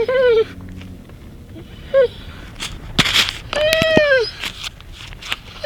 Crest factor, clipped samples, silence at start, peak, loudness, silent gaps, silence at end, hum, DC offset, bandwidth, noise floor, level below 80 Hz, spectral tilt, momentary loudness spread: 20 dB; under 0.1%; 0 s; 0 dBFS; -17 LUFS; none; 0 s; none; under 0.1%; 19.5 kHz; -37 dBFS; -38 dBFS; -3.5 dB/octave; 23 LU